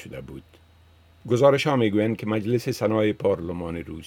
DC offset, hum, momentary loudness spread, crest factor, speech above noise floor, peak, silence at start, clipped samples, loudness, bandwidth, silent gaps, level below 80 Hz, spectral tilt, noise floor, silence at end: under 0.1%; none; 20 LU; 18 dB; 31 dB; -6 dBFS; 0 s; under 0.1%; -23 LUFS; 17 kHz; none; -56 dBFS; -6.5 dB/octave; -55 dBFS; 0 s